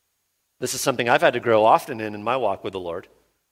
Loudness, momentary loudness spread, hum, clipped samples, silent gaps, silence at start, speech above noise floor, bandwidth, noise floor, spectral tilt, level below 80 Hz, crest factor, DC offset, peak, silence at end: -21 LUFS; 14 LU; none; under 0.1%; none; 0.6 s; 52 dB; 16.5 kHz; -73 dBFS; -3.5 dB/octave; -64 dBFS; 20 dB; under 0.1%; -2 dBFS; 0.5 s